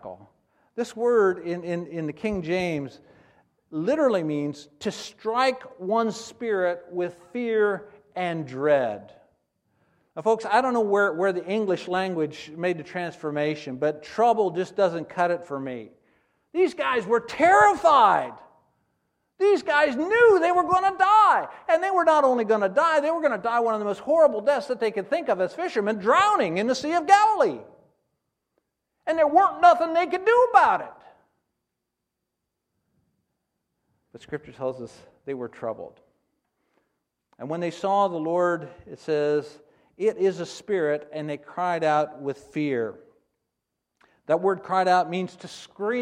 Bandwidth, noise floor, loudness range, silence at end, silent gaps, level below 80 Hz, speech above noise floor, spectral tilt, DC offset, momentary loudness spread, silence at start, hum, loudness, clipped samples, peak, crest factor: 11 kHz; -82 dBFS; 8 LU; 0 s; none; -66 dBFS; 59 dB; -5 dB/octave; under 0.1%; 16 LU; 0.05 s; none; -23 LUFS; under 0.1%; -4 dBFS; 22 dB